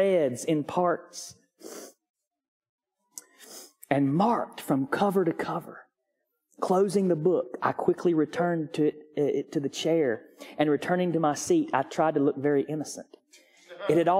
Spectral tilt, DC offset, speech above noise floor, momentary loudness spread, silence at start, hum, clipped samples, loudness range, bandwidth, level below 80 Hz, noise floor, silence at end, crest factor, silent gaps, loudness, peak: -6 dB/octave; under 0.1%; 54 dB; 19 LU; 0 s; none; under 0.1%; 6 LU; 16 kHz; -74 dBFS; -80 dBFS; 0 s; 20 dB; 2.10-2.14 s, 2.48-2.61 s, 2.69-2.78 s; -27 LUFS; -8 dBFS